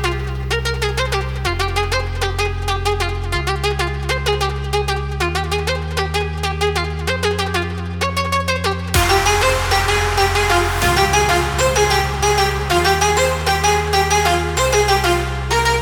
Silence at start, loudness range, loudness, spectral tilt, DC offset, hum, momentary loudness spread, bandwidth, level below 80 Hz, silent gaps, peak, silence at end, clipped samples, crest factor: 0 s; 5 LU; -17 LUFS; -3.5 dB/octave; under 0.1%; none; 6 LU; 19.5 kHz; -26 dBFS; none; -2 dBFS; 0 s; under 0.1%; 16 dB